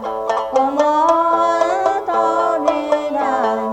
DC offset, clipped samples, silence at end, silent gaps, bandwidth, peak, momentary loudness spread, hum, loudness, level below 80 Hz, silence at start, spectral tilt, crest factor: under 0.1%; under 0.1%; 0 s; none; 9.6 kHz; -2 dBFS; 5 LU; none; -17 LUFS; -56 dBFS; 0 s; -4 dB/octave; 14 dB